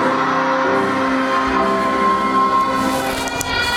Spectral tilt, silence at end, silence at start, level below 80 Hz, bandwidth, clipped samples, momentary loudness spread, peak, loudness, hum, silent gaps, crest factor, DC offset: -4 dB/octave; 0 s; 0 s; -42 dBFS; 16.5 kHz; under 0.1%; 4 LU; 0 dBFS; -17 LUFS; none; none; 16 dB; under 0.1%